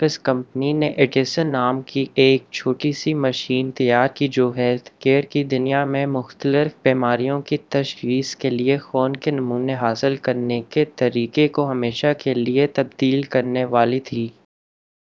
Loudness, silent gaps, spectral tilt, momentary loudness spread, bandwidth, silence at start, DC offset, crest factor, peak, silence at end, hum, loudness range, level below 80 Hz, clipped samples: -20 LUFS; none; -6.5 dB/octave; 5 LU; 7.6 kHz; 0 s; under 0.1%; 20 dB; 0 dBFS; 0.75 s; none; 2 LU; -66 dBFS; under 0.1%